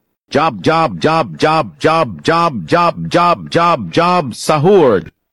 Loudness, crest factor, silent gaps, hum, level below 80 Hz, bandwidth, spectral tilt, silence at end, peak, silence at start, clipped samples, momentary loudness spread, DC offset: -13 LUFS; 12 dB; none; none; -48 dBFS; 12.5 kHz; -5.5 dB/octave; 0.25 s; -2 dBFS; 0.3 s; under 0.1%; 5 LU; 0.4%